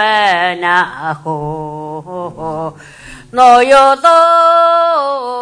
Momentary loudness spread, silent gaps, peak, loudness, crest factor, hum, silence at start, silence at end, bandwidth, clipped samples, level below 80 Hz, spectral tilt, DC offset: 17 LU; none; 0 dBFS; -10 LUFS; 12 dB; none; 0 s; 0 s; 10.5 kHz; 0.6%; -48 dBFS; -4 dB/octave; under 0.1%